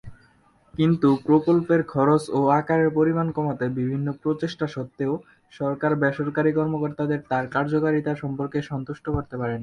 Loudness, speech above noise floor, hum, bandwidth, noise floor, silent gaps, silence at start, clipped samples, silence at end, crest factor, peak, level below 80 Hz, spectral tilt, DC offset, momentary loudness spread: -23 LUFS; 36 dB; none; 11.5 kHz; -59 dBFS; none; 0.05 s; under 0.1%; 0 s; 16 dB; -6 dBFS; -52 dBFS; -8.5 dB/octave; under 0.1%; 9 LU